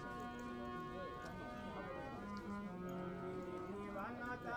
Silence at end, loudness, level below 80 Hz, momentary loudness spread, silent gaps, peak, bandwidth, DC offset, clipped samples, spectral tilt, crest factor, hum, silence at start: 0 s; -48 LUFS; -64 dBFS; 2 LU; none; -34 dBFS; 19 kHz; under 0.1%; under 0.1%; -6.5 dB/octave; 14 dB; none; 0 s